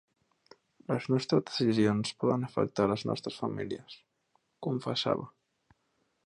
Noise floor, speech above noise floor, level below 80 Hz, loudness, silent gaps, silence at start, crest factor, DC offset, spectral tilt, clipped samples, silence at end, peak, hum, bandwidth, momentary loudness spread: -76 dBFS; 46 dB; -66 dBFS; -31 LUFS; none; 0.9 s; 20 dB; under 0.1%; -6 dB/octave; under 0.1%; 0.95 s; -12 dBFS; none; 11 kHz; 14 LU